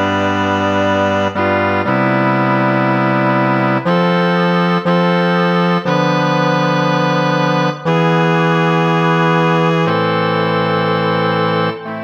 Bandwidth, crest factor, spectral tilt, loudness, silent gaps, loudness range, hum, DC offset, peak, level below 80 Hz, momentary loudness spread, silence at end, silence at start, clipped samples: 7.2 kHz; 12 dB; -7 dB/octave; -14 LUFS; none; 1 LU; none; under 0.1%; -2 dBFS; -64 dBFS; 2 LU; 0 s; 0 s; under 0.1%